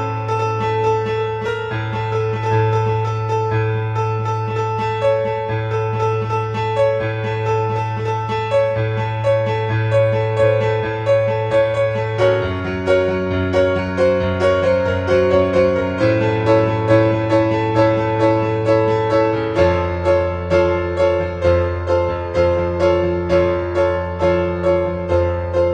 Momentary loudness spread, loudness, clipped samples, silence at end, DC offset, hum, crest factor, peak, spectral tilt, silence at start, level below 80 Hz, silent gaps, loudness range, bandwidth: 5 LU; -18 LUFS; under 0.1%; 0 s; under 0.1%; none; 16 dB; -2 dBFS; -7.5 dB/octave; 0 s; -38 dBFS; none; 4 LU; 8.8 kHz